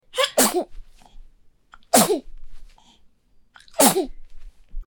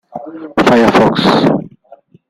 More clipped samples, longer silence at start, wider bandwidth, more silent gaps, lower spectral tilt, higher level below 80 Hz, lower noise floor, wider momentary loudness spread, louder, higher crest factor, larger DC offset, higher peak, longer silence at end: neither; about the same, 0.15 s vs 0.15 s; first, 19 kHz vs 15 kHz; neither; second, -2 dB/octave vs -6 dB/octave; about the same, -42 dBFS vs -46 dBFS; first, -55 dBFS vs -43 dBFS; about the same, 16 LU vs 15 LU; second, -19 LUFS vs -11 LUFS; first, 24 dB vs 12 dB; neither; about the same, 0 dBFS vs 0 dBFS; second, 0.05 s vs 0.6 s